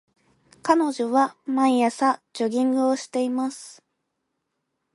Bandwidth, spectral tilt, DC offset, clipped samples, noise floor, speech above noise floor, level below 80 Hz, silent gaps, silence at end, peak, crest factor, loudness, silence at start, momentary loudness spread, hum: 11.5 kHz; -4 dB/octave; under 0.1%; under 0.1%; -78 dBFS; 56 dB; -76 dBFS; none; 1.25 s; -4 dBFS; 20 dB; -23 LUFS; 0.65 s; 9 LU; none